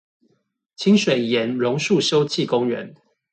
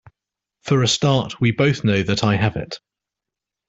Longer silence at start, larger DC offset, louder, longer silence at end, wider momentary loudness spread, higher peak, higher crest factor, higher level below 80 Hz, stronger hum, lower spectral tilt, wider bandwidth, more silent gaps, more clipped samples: first, 0.8 s vs 0.65 s; neither; about the same, -20 LUFS vs -19 LUFS; second, 0.4 s vs 0.9 s; second, 8 LU vs 15 LU; about the same, -6 dBFS vs -4 dBFS; about the same, 16 dB vs 18 dB; second, -66 dBFS vs -50 dBFS; neither; about the same, -5 dB/octave vs -5 dB/octave; about the same, 9 kHz vs 8.2 kHz; neither; neither